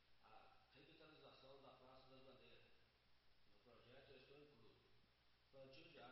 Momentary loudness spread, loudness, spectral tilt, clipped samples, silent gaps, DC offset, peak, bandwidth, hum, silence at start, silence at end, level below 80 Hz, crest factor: 4 LU; -67 LUFS; -3 dB/octave; under 0.1%; none; under 0.1%; -52 dBFS; 5.6 kHz; none; 0 s; 0 s; -86 dBFS; 18 dB